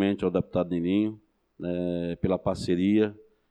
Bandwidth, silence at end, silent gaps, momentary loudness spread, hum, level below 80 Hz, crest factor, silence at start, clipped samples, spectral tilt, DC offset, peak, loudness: 10.5 kHz; 0.35 s; none; 7 LU; none; -54 dBFS; 16 dB; 0 s; under 0.1%; -7.5 dB/octave; under 0.1%; -12 dBFS; -27 LUFS